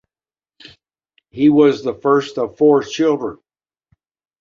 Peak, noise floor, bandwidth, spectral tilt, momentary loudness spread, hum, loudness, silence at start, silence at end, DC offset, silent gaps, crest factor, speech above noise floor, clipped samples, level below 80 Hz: -2 dBFS; under -90 dBFS; 7.4 kHz; -6.5 dB/octave; 11 LU; none; -16 LUFS; 1.35 s; 1.05 s; under 0.1%; none; 16 dB; over 75 dB; under 0.1%; -60 dBFS